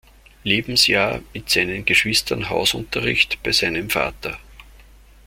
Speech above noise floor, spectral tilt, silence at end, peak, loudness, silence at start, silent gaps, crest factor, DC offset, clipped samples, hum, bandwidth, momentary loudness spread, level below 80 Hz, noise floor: 26 dB; -2.5 dB/octave; 0.65 s; -2 dBFS; -18 LUFS; 0.45 s; none; 20 dB; under 0.1%; under 0.1%; none; 16.5 kHz; 13 LU; -44 dBFS; -47 dBFS